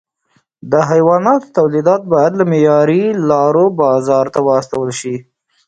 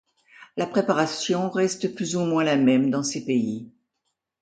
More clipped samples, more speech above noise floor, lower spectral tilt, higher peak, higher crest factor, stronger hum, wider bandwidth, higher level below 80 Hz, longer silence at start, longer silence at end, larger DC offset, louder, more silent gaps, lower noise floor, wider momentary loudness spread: neither; second, 48 dB vs 56 dB; first, -7 dB/octave vs -5 dB/octave; first, 0 dBFS vs -6 dBFS; second, 12 dB vs 18 dB; neither; about the same, 9.2 kHz vs 9.4 kHz; first, -56 dBFS vs -70 dBFS; first, 0.65 s vs 0.4 s; second, 0.45 s vs 0.75 s; neither; first, -13 LUFS vs -23 LUFS; neither; second, -60 dBFS vs -79 dBFS; about the same, 9 LU vs 10 LU